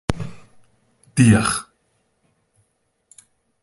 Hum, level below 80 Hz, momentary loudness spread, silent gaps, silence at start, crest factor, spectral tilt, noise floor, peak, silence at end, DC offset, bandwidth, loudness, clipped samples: none; -42 dBFS; 17 LU; none; 0.1 s; 22 dB; -5.5 dB/octave; -69 dBFS; 0 dBFS; 2 s; under 0.1%; 11.5 kHz; -18 LUFS; under 0.1%